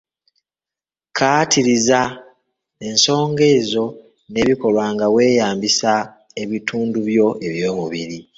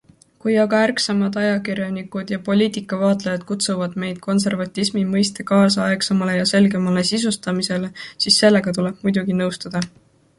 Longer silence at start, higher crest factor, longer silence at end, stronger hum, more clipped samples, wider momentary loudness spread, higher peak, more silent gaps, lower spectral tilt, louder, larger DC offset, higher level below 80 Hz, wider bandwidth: first, 1.15 s vs 0.45 s; about the same, 18 dB vs 18 dB; second, 0.15 s vs 0.5 s; neither; neither; about the same, 12 LU vs 10 LU; about the same, 0 dBFS vs -2 dBFS; neither; about the same, -3.5 dB/octave vs -4.5 dB/octave; about the same, -17 LUFS vs -19 LUFS; neither; about the same, -54 dBFS vs -58 dBFS; second, 8 kHz vs 11.5 kHz